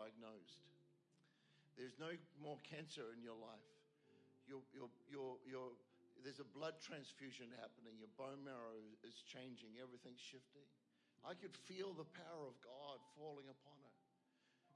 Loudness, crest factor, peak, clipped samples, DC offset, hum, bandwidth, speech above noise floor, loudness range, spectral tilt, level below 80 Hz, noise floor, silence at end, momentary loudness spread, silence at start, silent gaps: -57 LUFS; 20 dB; -38 dBFS; under 0.1%; under 0.1%; none; 10.5 kHz; 25 dB; 3 LU; -4.5 dB/octave; under -90 dBFS; -82 dBFS; 0 s; 9 LU; 0 s; none